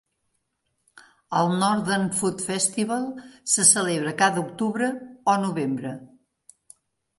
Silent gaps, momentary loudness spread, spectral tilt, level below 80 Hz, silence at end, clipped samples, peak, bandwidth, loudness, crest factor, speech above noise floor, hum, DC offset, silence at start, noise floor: none; 12 LU; -3 dB/octave; -68 dBFS; 1.15 s; under 0.1%; -4 dBFS; 12 kHz; -23 LUFS; 22 dB; 52 dB; none; under 0.1%; 0.95 s; -75 dBFS